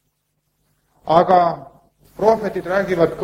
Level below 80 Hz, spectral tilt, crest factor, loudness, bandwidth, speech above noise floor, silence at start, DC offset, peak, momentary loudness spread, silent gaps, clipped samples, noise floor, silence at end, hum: -52 dBFS; -7 dB/octave; 18 dB; -17 LUFS; 15.5 kHz; 54 dB; 1.05 s; under 0.1%; 0 dBFS; 10 LU; none; under 0.1%; -70 dBFS; 0 s; none